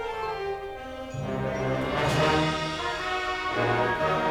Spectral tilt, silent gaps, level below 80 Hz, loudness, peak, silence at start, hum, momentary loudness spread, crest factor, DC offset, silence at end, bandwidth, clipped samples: -5 dB/octave; none; -46 dBFS; -27 LUFS; -12 dBFS; 0 s; none; 11 LU; 16 dB; under 0.1%; 0 s; 17.5 kHz; under 0.1%